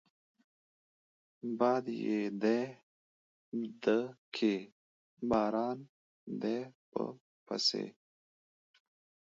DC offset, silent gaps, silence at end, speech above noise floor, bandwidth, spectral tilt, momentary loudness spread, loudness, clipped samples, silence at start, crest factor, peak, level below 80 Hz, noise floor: under 0.1%; 2.83-3.52 s, 4.18-4.32 s, 4.72-5.17 s, 5.89-6.27 s, 6.75-6.92 s, 7.21-7.46 s; 1.35 s; over 56 dB; 7.6 kHz; -3.5 dB/octave; 12 LU; -35 LUFS; under 0.1%; 1.45 s; 22 dB; -16 dBFS; -74 dBFS; under -90 dBFS